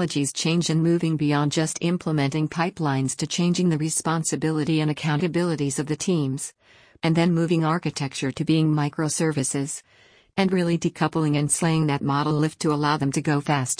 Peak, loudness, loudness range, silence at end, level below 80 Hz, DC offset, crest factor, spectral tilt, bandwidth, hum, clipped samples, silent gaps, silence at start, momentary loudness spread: -8 dBFS; -23 LUFS; 2 LU; 0.05 s; -60 dBFS; under 0.1%; 14 dB; -5 dB/octave; 10.5 kHz; none; under 0.1%; none; 0 s; 5 LU